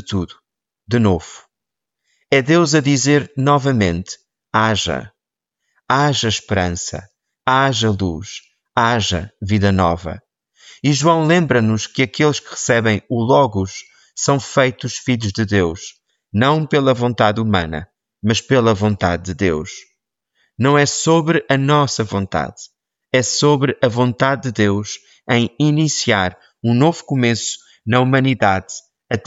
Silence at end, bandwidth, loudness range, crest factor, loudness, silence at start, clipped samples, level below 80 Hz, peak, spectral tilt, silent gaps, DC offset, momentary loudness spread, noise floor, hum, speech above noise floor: 0.05 s; 8 kHz; 3 LU; 16 dB; -17 LUFS; 0.05 s; under 0.1%; -46 dBFS; -2 dBFS; -5 dB/octave; none; under 0.1%; 12 LU; -84 dBFS; none; 68 dB